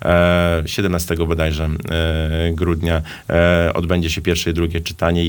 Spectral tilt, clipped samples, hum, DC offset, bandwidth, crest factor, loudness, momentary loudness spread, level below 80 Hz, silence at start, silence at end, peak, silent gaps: -5.5 dB/octave; under 0.1%; none; under 0.1%; 19.5 kHz; 16 dB; -18 LUFS; 6 LU; -28 dBFS; 0 s; 0 s; -2 dBFS; none